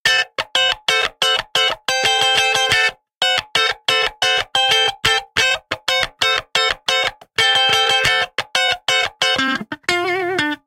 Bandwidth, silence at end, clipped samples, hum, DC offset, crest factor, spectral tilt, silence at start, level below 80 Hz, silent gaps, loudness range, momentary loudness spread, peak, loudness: 17 kHz; 0.1 s; under 0.1%; none; under 0.1%; 18 dB; -0.5 dB/octave; 0.05 s; -50 dBFS; 3.17-3.21 s; 1 LU; 6 LU; 0 dBFS; -16 LUFS